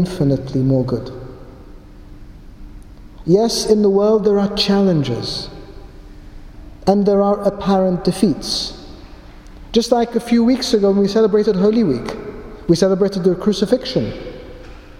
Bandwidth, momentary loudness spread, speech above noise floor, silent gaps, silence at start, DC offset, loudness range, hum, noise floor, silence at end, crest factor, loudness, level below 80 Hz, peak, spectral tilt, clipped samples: 15.5 kHz; 16 LU; 22 dB; none; 0 s; under 0.1%; 3 LU; none; -38 dBFS; 0.05 s; 16 dB; -16 LUFS; -38 dBFS; 0 dBFS; -6 dB/octave; under 0.1%